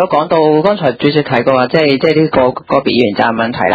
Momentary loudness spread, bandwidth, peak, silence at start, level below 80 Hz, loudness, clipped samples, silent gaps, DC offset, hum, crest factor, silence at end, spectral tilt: 3 LU; 7.4 kHz; 0 dBFS; 0 s; -46 dBFS; -12 LUFS; 0.2%; none; under 0.1%; none; 12 dB; 0 s; -8 dB/octave